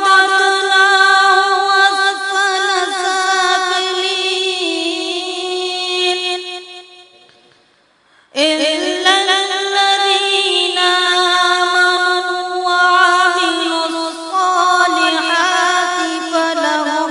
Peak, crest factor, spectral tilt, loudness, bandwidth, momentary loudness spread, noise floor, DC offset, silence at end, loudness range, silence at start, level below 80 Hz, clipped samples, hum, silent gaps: 0 dBFS; 14 dB; 1 dB/octave; -13 LUFS; 11 kHz; 9 LU; -54 dBFS; under 0.1%; 0 s; 7 LU; 0 s; -72 dBFS; under 0.1%; none; none